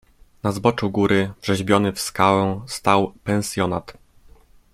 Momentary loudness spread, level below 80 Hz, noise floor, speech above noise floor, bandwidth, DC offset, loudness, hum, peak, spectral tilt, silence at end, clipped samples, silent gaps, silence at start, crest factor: 7 LU; -50 dBFS; -50 dBFS; 30 dB; 16 kHz; under 0.1%; -21 LUFS; none; -2 dBFS; -5.5 dB/octave; 0.8 s; under 0.1%; none; 0.45 s; 20 dB